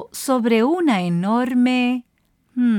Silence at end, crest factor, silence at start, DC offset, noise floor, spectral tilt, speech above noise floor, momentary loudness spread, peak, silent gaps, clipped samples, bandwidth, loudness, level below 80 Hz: 0 s; 12 dB; 0 s; under 0.1%; -40 dBFS; -6 dB/octave; 22 dB; 5 LU; -6 dBFS; none; under 0.1%; 18.5 kHz; -19 LUFS; -66 dBFS